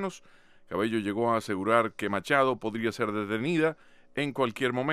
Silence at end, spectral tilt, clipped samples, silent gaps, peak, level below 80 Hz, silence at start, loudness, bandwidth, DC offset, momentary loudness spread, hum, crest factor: 0 s; -5.5 dB/octave; under 0.1%; none; -8 dBFS; -68 dBFS; 0 s; -28 LUFS; 15 kHz; under 0.1%; 8 LU; none; 20 dB